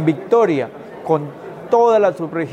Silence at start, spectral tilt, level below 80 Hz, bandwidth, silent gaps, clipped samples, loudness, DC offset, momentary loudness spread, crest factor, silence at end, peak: 0 s; -7.5 dB/octave; -64 dBFS; 9.2 kHz; none; under 0.1%; -17 LUFS; under 0.1%; 17 LU; 16 dB; 0 s; -2 dBFS